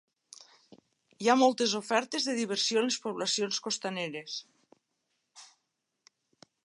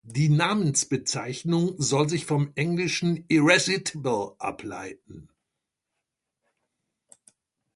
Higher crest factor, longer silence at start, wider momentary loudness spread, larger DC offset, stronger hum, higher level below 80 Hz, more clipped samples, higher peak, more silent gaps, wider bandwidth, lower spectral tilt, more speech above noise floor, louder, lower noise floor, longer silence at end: about the same, 22 dB vs 22 dB; first, 1.2 s vs 0.05 s; about the same, 13 LU vs 13 LU; neither; neither; second, -86 dBFS vs -64 dBFS; neither; second, -10 dBFS vs -4 dBFS; neither; about the same, 11.5 kHz vs 11.5 kHz; second, -2.5 dB/octave vs -4.5 dB/octave; second, 52 dB vs 59 dB; second, -29 LUFS vs -24 LUFS; about the same, -82 dBFS vs -84 dBFS; second, 1.2 s vs 2.55 s